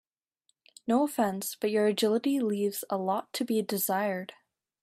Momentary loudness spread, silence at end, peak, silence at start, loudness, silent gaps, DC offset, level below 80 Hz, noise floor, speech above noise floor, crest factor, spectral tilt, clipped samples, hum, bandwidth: 6 LU; 0.5 s; -14 dBFS; 0.85 s; -29 LUFS; none; under 0.1%; -78 dBFS; -76 dBFS; 47 dB; 16 dB; -4.5 dB/octave; under 0.1%; none; 16 kHz